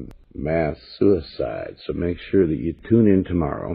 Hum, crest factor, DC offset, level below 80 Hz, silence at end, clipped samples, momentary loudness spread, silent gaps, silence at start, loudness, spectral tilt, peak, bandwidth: none; 16 dB; under 0.1%; -40 dBFS; 0 s; under 0.1%; 12 LU; none; 0 s; -22 LUFS; -11 dB/octave; -4 dBFS; 5.2 kHz